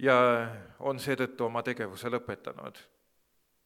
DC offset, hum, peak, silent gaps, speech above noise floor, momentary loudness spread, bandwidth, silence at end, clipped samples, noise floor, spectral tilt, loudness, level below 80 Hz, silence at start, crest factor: under 0.1%; none; -8 dBFS; none; 42 dB; 17 LU; 16 kHz; 0.85 s; under 0.1%; -72 dBFS; -5.5 dB/octave; -31 LUFS; -72 dBFS; 0 s; 22 dB